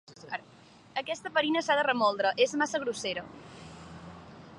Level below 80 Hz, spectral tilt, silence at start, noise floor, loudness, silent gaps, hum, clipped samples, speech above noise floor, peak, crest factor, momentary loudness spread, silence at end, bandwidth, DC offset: -66 dBFS; -3 dB/octave; 0.1 s; -56 dBFS; -29 LUFS; none; none; under 0.1%; 27 dB; -12 dBFS; 20 dB; 21 LU; 0 s; 11.5 kHz; under 0.1%